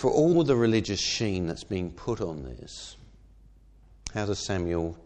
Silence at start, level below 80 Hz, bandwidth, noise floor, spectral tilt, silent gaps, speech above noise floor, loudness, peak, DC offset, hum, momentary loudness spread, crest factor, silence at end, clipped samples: 0 s; -48 dBFS; 9.6 kHz; -55 dBFS; -5.5 dB/octave; none; 28 dB; -27 LUFS; -10 dBFS; under 0.1%; none; 19 LU; 18 dB; 0.05 s; under 0.1%